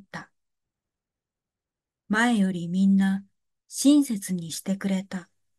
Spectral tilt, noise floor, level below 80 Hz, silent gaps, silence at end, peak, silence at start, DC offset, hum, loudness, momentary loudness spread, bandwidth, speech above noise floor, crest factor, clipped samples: -5 dB/octave; -90 dBFS; -76 dBFS; none; 0.35 s; -8 dBFS; 0.15 s; under 0.1%; none; -24 LUFS; 17 LU; 12.5 kHz; 66 dB; 18 dB; under 0.1%